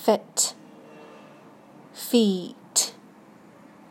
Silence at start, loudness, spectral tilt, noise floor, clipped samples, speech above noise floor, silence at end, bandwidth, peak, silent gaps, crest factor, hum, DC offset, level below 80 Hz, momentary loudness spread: 0 s; -24 LUFS; -3 dB/octave; -51 dBFS; under 0.1%; 27 dB; 1 s; 16.5 kHz; -6 dBFS; none; 22 dB; none; under 0.1%; -82 dBFS; 25 LU